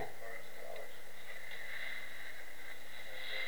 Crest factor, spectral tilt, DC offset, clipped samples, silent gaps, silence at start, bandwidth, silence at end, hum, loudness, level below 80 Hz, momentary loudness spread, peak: 18 dB; -2 dB/octave; 2%; under 0.1%; none; 0 s; over 20 kHz; 0 s; 60 Hz at -70 dBFS; -47 LUFS; -72 dBFS; 7 LU; -28 dBFS